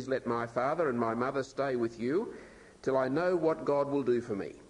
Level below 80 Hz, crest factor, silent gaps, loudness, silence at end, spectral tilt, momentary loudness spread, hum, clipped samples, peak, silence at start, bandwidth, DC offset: -66 dBFS; 16 dB; none; -31 LUFS; 0 s; -7 dB/octave; 5 LU; none; under 0.1%; -16 dBFS; 0 s; 10.5 kHz; under 0.1%